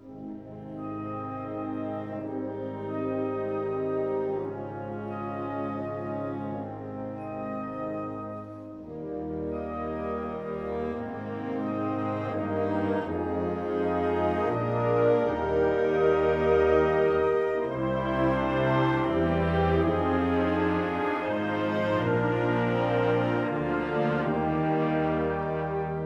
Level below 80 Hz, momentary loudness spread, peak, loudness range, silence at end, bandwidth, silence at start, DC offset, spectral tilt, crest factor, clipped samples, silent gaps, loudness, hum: -48 dBFS; 11 LU; -12 dBFS; 10 LU; 0 s; 7.4 kHz; 0 s; under 0.1%; -8.5 dB/octave; 16 dB; under 0.1%; none; -28 LUFS; none